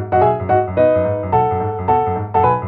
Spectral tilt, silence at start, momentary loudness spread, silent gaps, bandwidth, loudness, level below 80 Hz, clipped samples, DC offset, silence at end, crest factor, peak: -11.5 dB/octave; 0 s; 3 LU; none; 4.4 kHz; -16 LUFS; -42 dBFS; under 0.1%; under 0.1%; 0 s; 14 dB; -2 dBFS